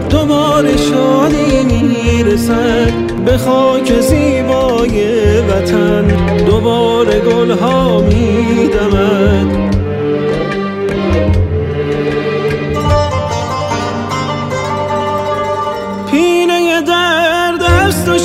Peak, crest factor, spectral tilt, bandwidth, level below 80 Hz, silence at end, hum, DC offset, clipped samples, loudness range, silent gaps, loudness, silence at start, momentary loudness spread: 0 dBFS; 12 dB; -6 dB/octave; 16 kHz; -24 dBFS; 0 s; none; under 0.1%; under 0.1%; 4 LU; none; -12 LUFS; 0 s; 6 LU